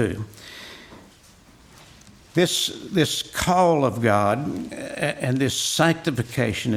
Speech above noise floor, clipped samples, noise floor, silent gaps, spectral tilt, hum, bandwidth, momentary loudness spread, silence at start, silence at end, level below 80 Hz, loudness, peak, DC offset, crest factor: 29 dB; under 0.1%; -51 dBFS; none; -4.5 dB/octave; none; 16.5 kHz; 17 LU; 0 s; 0 s; -50 dBFS; -22 LUFS; -4 dBFS; under 0.1%; 20 dB